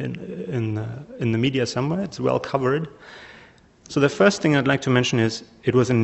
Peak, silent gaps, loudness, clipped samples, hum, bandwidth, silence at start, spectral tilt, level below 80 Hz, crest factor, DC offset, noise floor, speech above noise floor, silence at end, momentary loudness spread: -4 dBFS; none; -22 LUFS; under 0.1%; none; 8.2 kHz; 0 s; -6 dB/octave; -56 dBFS; 18 dB; under 0.1%; -50 dBFS; 29 dB; 0 s; 14 LU